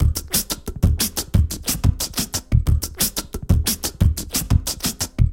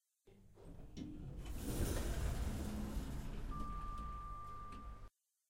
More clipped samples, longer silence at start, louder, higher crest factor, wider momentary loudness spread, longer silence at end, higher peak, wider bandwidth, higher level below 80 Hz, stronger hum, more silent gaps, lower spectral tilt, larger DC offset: neither; second, 0 s vs 0.25 s; first, -21 LUFS vs -46 LUFS; about the same, 18 dB vs 18 dB; second, 4 LU vs 17 LU; second, 0 s vs 0.4 s; first, -2 dBFS vs -26 dBFS; about the same, 17 kHz vs 16 kHz; first, -24 dBFS vs -46 dBFS; neither; neither; second, -4 dB/octave vs -5.5 dB/octave; first, 0.1% vs under 0.1%